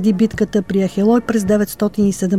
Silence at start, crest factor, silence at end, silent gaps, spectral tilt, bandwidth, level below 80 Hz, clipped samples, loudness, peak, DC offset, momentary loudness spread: 0 s; 12 dB; 0 s; none; -6.5 dB/octave; 15 kHz; -44 dBFS; under 0.1%; -16 LUFS; -4 dBFS; 0.5%; 4 LU